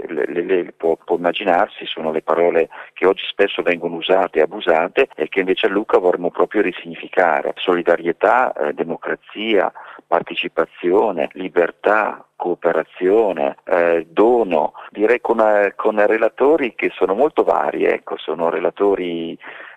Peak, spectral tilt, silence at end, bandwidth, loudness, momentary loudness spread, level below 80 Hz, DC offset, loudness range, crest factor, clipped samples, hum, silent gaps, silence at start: 0 dBFS; -6.5 dB/octave; 0.05 s; 8 kHz; -18 LUFS; 8 LU; -56 dBFS; under 0.1%; 3 LU; 16 dB; under 0.1%; none; none; 0 s